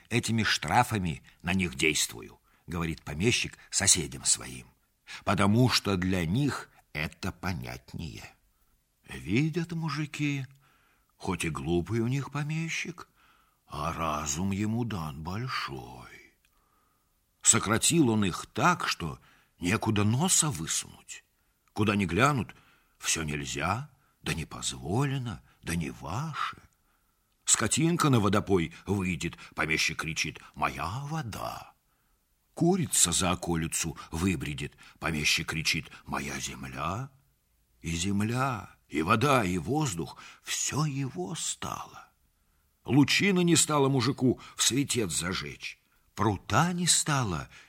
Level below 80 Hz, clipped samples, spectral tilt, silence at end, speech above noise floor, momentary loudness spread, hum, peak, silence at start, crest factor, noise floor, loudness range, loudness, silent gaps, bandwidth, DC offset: -52 dBFS; under 0.1%; -3.5 dB/octave; 0.05 s; 43 dB; 16 LU; none; -6 dBFS; 0.1 s; 24 dB; -72 dBFS; 7 LU; -28 LUFS; none; 16 kHz; under 0.1%